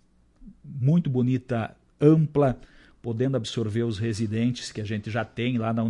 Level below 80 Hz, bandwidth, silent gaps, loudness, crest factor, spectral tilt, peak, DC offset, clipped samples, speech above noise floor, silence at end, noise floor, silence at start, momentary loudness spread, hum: -54 dBFS; 11 kHz; none; -25 LUFS; 20 dB; -7.5 dB/octave; -6 dBFS; under 0.1%; under 0.1%; 26 dB; 0 s; -51 dBFS; 0.4 s; 12 LU; none